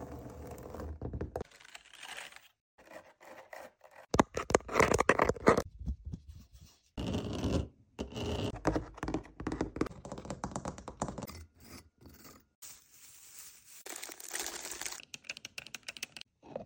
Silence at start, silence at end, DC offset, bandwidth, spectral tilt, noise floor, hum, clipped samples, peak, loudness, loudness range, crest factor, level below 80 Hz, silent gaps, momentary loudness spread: 0 s; 0 s; under 0.1%; 17 kHz; -4.5 dB/octave; -59 dBFS; none; under 0.1%; -8 dBFS; -36 LUFS; 15 LU; 30 dB; -50 dBFS; 2.61-2.78 s, 12.55-12.62 s; 24 LU